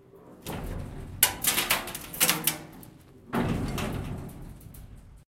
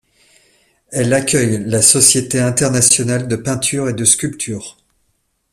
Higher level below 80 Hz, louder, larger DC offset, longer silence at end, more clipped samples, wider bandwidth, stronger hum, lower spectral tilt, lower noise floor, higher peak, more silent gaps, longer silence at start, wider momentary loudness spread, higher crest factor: about the same, -46 dBFS vs -48 dBFS; second, -27 LUFS vs -13 LUFS; neither; second, 0.1 s vs 0.8 s; neither; second, 17 kHz vs over 20 kHz; neither; about the same, -2.5 dB/octave vs -3.5 dB/octave; second, -50 dBFS vs -65 dBFS; second, -4 dBFS vs 0 dBFS; neither; second, 0.15 s vs 0.9 s; first, 23 LU vs 14 LU; first, 28 dB vs 16 dB